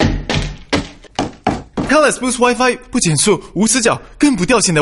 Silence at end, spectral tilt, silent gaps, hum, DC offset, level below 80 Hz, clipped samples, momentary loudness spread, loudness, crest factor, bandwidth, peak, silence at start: 0 s; -4 dB/octave; none; none; under 0.1%; -32 dBFS; under 0.1%; 9 LU; -15 LUFS; 14 dB; 11.5 kHz; 0 dBFS; 0 s